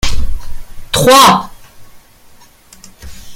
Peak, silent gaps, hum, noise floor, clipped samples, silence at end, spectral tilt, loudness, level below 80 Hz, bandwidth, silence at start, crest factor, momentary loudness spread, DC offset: 0 dBFS; none; none; -41 dBFS; 0.3%; 0 s; -3 dB/octave; -9 LUFS; -24 dBFS; 17.5 kHz; 0.05 s; 12 dB; 24 LU; under 0.1%